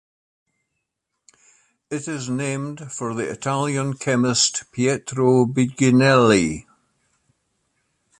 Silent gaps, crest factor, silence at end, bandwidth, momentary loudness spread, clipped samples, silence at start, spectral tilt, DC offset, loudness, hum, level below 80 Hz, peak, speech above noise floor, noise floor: none; 20 dB; 1.6 s; 11.5 kHz; 14 LU; under 0.1%; 1.9 s; -4.5 dB/octave; under 0.1%; -20 LUFS; none; -54 dBFS; -2 dBFS; 59 dB; -79 dBFS